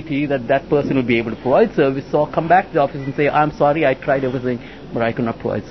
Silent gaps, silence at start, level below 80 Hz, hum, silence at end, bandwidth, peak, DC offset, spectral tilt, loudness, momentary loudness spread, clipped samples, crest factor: none; 0 s; -46 dBFS; none; 0 s; 6.2 kHz; -2 dBFS; 0.4%; -8.5 dB/octave; -18 LUFS; 7 LU; under 0.1%; 16 dB